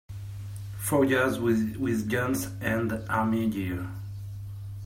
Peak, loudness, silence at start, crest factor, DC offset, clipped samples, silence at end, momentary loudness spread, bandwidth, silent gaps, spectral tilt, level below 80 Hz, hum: -12 dBFS; -27 LUFS; 0.1 s; 18 dB; under 0.1%; under 0.1%; 0 s; 15 LU; 16 kHz; none; -6 dB/octave; -52 dBFS; none